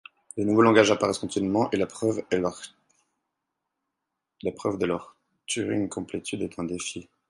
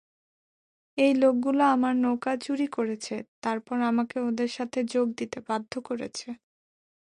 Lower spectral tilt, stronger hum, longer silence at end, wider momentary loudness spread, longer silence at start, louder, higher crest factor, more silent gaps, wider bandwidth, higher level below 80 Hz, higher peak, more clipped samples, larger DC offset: about the same, -5 dB/octave vs -4.5 dB/octave; neither; second, 0.25 s vs 0.75 s; about the same, 15 LU vs 13 LU; second, 0.35 s vs 0.95 s; about the same, -26 LUFS vs -27 LUFS; first, 24 dB vs 16 dB; second, none vs 3.28-3.42 s; about the same, 11.5 kHz vs 11 kHz; first, -60 dBFS vs -72 dBFS; first, -2 dBFS vs -12 dBFS; neither; neither